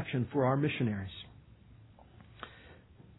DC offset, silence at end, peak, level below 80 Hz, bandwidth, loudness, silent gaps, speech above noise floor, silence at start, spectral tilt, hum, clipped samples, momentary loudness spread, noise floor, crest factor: under 0.1%; 0.4 s; -18 dBFS; -64 dBFS; 4.1 kHz; -32 LUFS; none; 25 dB; 0 s; -10.5 dB/octave; none; under 0.1%; 21 LU; -57 dBFS; 18 dB